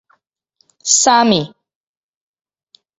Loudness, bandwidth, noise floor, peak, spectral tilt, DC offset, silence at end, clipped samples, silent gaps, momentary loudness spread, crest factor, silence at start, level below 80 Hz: -13 LUFS; 8 kHz; -63 dBFS; 0 dBFS; -2 dB/octave; under 0.1%; 1.5 s; under 0.1%; none; 16 LU; 18 dB; 0.85 s; -60 dBFS